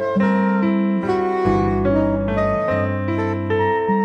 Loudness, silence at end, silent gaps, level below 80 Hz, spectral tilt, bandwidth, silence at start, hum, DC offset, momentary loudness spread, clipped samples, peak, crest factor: -19 LUFS; 0 s; none; -38 dBFS; -9 dB/octave; 6.6 kHz; 0 s; none; under 0.1%; 3 LU; under 0.1%; -6 dBFS; 12 dB